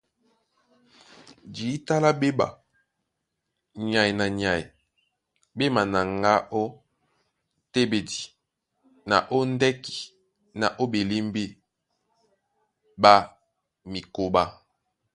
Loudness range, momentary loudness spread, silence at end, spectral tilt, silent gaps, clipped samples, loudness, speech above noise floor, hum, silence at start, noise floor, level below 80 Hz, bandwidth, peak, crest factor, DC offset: 4 LU; 16 LU; 0.6 s; -5 dB/octave; none; under 0.1%; -24 LUFS; 57 dB; none; 1.45 s; -81 dBFS; -56 dBFS; 11.5 kHz; 0 dBFS; 26 dB; under 0.1%